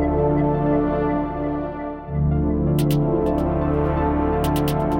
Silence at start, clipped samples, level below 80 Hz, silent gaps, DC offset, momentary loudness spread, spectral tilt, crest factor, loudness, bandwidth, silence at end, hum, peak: 0 s; under 0.1%; -30 dBFS; none; under 0.1%; 6 LU; -8 dB/octave; 12 dB; -21 LUFS; 16.5 kHz; 0 s; none; -8 dBFS